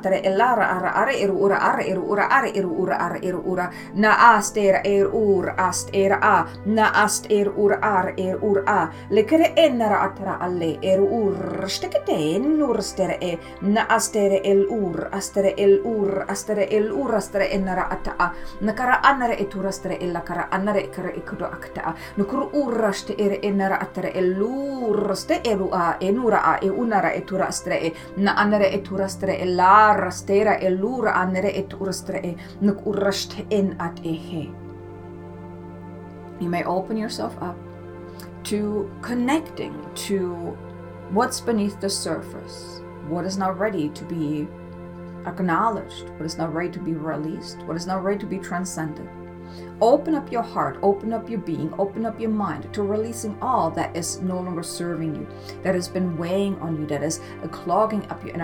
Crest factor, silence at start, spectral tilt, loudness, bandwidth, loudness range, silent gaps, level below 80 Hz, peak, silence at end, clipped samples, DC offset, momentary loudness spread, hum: 22 dB; 0 s; -5 dB/octave; -22 LUFS; 18.5 kHz; 9 LU; none; -50 dBFS; 0 dBFS; 0 s; under 0.1%; under 0.1%; 14 LU; none